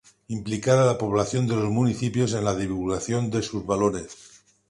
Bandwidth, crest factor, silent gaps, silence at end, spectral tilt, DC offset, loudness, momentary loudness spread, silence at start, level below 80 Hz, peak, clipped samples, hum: 11.5 kHz; 20 dB; none; 0.55 s; -6 dB/octave; under 0.1%; -24 LUFS; 10 LU; 0.3 s; -50 dBFS; -6 dBFS; under 0.1%; none